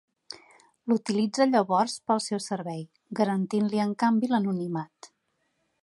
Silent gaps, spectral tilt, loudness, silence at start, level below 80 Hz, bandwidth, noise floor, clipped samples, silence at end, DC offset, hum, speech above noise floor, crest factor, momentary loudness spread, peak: none; -5.5 dB/octave; -27 LUFS; 0.85 s; -78 dBFS; 11.5 kHz; -75 dBFS; under 0.1%; 0.75 s; under 0.1%; none; 49 dB; 20 dB; 18 LU; -8 dBFS